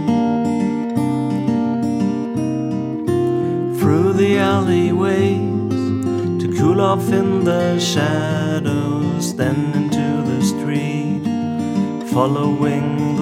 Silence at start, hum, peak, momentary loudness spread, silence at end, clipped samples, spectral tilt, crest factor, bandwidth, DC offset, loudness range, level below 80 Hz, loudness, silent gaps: 0 s; none; 0 dBFS; 5 LU; 0 s; under 0.1%; -6.5 dB/octave; 16 dB; 16 kHz; under 0.1%; 3 LU; -58 dBFS; -18 LUFS; none